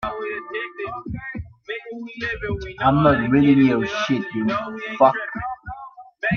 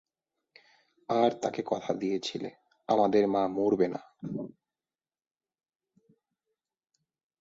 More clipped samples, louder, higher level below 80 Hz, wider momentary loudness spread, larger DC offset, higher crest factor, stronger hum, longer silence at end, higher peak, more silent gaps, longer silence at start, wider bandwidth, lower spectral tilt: neither; first, -21 LUFS vs -29 LUFS; first, -44 dBFS vs -72 dBFS; about the same, 17 LU vs 16 LU; neither; about the same, 18 dB vs 20 dB; neither; second, 0 s vs 2.95 s; first, -2 dBFS vs -12 dBFS; neither; second, 0 s vs 1.1 s; second, 6.8 kHz vs 7.8 kHz; about the same, -7 dB/octave vs -6 dB/octave